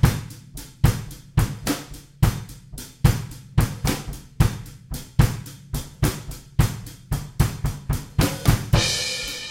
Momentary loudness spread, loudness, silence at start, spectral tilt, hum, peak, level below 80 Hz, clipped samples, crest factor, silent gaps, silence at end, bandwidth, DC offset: 16 LU; -24 LUFS; 0 s; -5 dB/octave; none; -2 dBFS; -30 dBFS; under 0.1%; 20 dB; none; 0 s; 17 kHz; under 0.1%